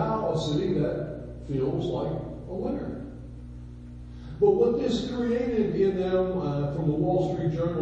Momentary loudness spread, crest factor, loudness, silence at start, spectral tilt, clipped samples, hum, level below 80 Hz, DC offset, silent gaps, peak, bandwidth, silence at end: 19 LU; 16 dB; -27 LUFS; 0 s; -8 dB/octave; under 0.1%; 60 Hz at -40 dBFS; -44 dBFS; under 0.1%; none; -10 dBFS; 8.6 kHz; 0 s